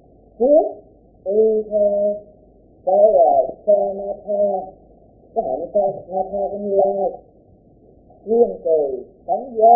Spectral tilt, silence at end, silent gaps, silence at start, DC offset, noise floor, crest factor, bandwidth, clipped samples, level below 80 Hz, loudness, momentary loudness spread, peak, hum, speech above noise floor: -16 dB/octave; 0 s; none; 0.4 s; under 0.1%; -50 dBFS; 18 dB; 0.9 kHz; under 0.1%; -54 dBFS; -19 LUFS; 12 LU; -2 dBFS; none; 33 dB